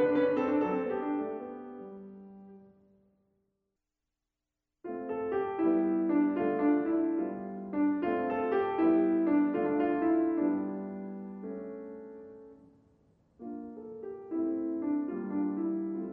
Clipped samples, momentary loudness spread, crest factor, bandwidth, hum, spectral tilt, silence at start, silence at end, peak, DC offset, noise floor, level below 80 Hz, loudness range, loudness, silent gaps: under 0.1%; 18 LU; 16 dB; 4.3 kHz; none; -10 dB/octave; 0 s; 0 s; -16 dBFS; under 0.1%; -88 dBFS; -70 dBFS; 15 LU; -31 LUFS; none